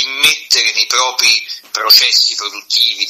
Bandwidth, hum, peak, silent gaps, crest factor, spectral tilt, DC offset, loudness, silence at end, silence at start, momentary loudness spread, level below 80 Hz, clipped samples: over 20 kHz; none; 0 dBFS; none; 14 dB; 3 dB/octave; under 0.1%; -10 LUFS; 0 s; 0 s; 10 LU; -62 dBFS; 0.2%